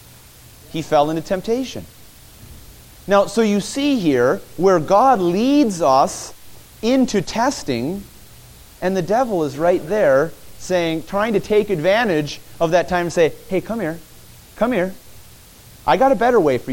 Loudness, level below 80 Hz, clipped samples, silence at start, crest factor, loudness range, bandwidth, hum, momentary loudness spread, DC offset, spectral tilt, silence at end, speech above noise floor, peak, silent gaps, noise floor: -18 LUFS; -46 dBFS; under 0.1%; 0.7 s; 16 dB; 5 LU; 17 kHz; none; 11 LU; under 0.1%; -5.5 dB/octave; 0 s; 26 dB; -2 dBFS; none; -44 dBFS